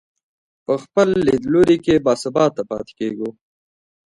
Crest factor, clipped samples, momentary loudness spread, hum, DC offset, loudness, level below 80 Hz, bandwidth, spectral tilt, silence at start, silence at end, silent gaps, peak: 18 dB; under 0.1%; 13 LU; none; under 0.1%; -18 LUFS; -50 dBFS; 11.5 kHz; -6.5 dB/octave; 0.7 s; 0.85 s; none; -2 dBFS